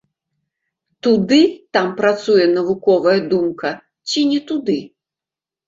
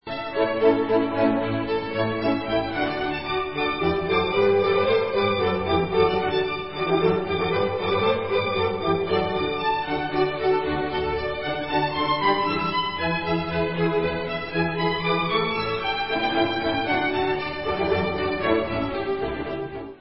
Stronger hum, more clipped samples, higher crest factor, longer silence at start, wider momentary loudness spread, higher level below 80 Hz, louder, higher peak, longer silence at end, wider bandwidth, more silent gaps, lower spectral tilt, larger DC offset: neither; neither; about the same, 16 dB vs 16 dB; first, 1.05 s vs 0 s; first, 9 LU vs 6 LU; second, -60 dBFS vs -46 dBFS; first, -17 LUFS vs -24 LUFS; first, -2 dBFS vs -6 dBFS; first, 0.8 s vs 0 s; first, 7.8 kHz vs 5.8 kHz; neither; second, -5 dB/octave vs -10 dB/octave; second, under 0.1% vs 0.5%